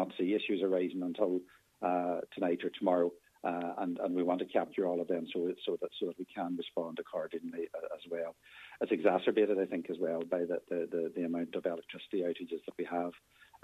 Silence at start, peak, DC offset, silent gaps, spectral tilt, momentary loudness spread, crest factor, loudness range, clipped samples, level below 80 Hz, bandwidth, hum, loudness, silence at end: 0 s; -14 dBFS; under 0.1%; none; -7 dB/octave; 10 LU; 22 dB; 5 LU; under 0.1%; -82 dBFS; 13.5 kHz; none; -35 LUFS; 0.45 s